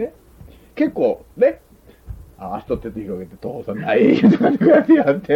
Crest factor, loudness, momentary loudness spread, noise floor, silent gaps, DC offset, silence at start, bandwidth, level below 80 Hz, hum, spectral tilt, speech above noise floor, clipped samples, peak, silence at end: 14 dB; -17 LUFS; 18 LU; -44 dBFS; none; under 0.1%; 0 s; 6.2 kHz; -46 dBFS; none; -8.5 dB/octave; 27 dB; under 0.1%; -4 dBFS; 0 s